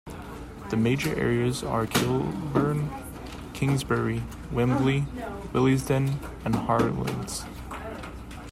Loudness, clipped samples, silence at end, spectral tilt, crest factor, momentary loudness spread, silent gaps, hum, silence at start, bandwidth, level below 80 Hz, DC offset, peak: -27 LUFS; under 0.1%; 0 s; -6 dB/octave; 18 dB; 15 LU; none; none; 0.05 s; 16 kHz; -44 dBFS; under 0.1%; -8 dBFS